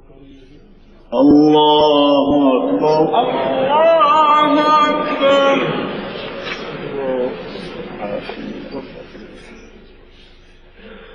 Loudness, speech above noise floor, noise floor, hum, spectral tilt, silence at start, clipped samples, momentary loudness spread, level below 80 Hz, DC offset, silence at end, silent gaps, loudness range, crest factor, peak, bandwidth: -14 LUFS; 31 dB; -43 dBFS; none; -6 dB/octave; 1.1 s; under 0.1%; 18 LU; -46 dBFS; under 0.1%; 0 s; none; 17 LU; 14 dB; -2 dBFS; 7.6 kHz